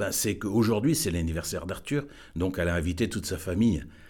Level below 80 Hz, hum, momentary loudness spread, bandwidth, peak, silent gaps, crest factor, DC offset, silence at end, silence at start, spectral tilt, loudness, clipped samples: -44 dBFS; none; 7 LU; 19 kHz; -14 dBFS; none; 14 dB; under 0.1%; 0 s; 0 s; -5 dB/octave; -28 LUFS; under 0.1%